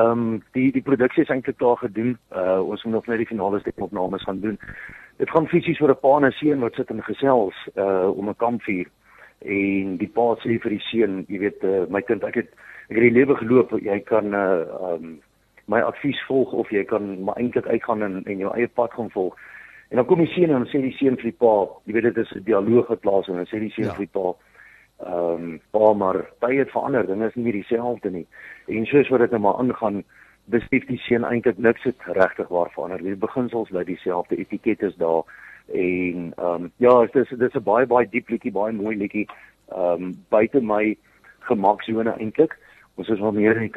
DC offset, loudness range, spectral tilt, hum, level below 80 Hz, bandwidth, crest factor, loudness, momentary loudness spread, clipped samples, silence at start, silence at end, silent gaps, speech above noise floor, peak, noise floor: under 0.1%; 4 LU; -8.5 dB/octave; none; -58 dBFS; 4.8 kHz; 20 dB; -22 LUFS; 10 LU; under 0.1%; 0 s; 0 s; none; 29 dB; -2 dBFS; -51 dBFS